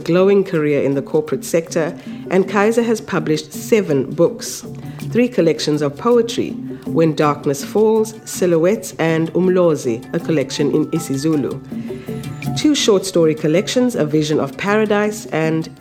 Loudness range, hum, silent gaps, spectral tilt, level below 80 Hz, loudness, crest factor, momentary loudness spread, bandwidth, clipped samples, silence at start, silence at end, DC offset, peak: 2 LU; none; none; -5.5 dB/octave; -54 dBFS; -17 LUFS; 16 dB; 10 LU; 16.5 kHz; under 0.1%; 0 s; 0.05 s; under 0.1%; 0 dBFS